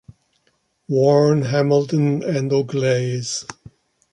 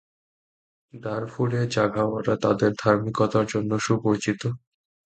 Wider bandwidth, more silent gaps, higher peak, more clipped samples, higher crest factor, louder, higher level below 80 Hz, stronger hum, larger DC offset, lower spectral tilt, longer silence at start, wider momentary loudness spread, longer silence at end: first, 11 kHz vs 9 kHz; neither; about the same, -4 dBFS vs -6 dBFS; neither; about the same, 16 dB vs 20 dB; first, -19 LUFS vs -24 LUFS; about the same, -60 dBFS vs -58 dBFS; neither; neither; about the same, -6 dB/octave vs -6.5 dB/octave; second, 0.1 s vs 0.95 s; about the same, 10 LU vs 9 LU; about the same, 0.6 s vs 0.5 s